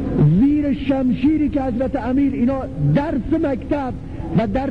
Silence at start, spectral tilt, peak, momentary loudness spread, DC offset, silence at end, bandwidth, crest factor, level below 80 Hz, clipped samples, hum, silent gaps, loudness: 0 s; -10 dB/octave; -6 dBFS; 7 LU; 1%; 0 s; 5.2 kHz; 12 dB; -34 dBFS; under 0.1%; none; none; -19 LUFS